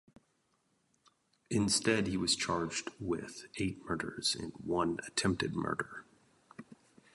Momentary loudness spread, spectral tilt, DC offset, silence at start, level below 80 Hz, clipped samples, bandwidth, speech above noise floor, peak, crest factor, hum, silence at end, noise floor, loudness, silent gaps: 15 LU; -3.5 dB/octave; under 0.1%; 1.5 s; -60 dBFS; under 0.1%; 11.5 kHz; 42 dB; -16 dBFS; 22 dB; none; 0.4 s; -76 dBFS; -34 LUFS; none